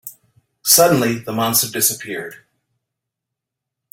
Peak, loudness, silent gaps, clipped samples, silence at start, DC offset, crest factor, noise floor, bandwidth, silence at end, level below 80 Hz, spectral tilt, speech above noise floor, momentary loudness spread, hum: 0 dBFS; -15 LUFS; none; under 0.1%; 0.05 s; under 0.1%; 20 dB; -82 dBFS; 16.5 kHz; 1.6 s; -58 dBFS; -2.5 dB/octave; 65 dB; 18 LU; none